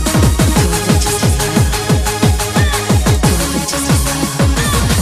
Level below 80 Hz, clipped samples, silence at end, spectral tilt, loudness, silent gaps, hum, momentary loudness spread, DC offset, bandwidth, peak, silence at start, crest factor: -18 dBFS; under 0.1%; 0 s; -4.5 dB/octave; -13 LUFS; none; none; 3 LU; under 0.1%; 16 kHz; 0 dBFS; 0 s; 12 dB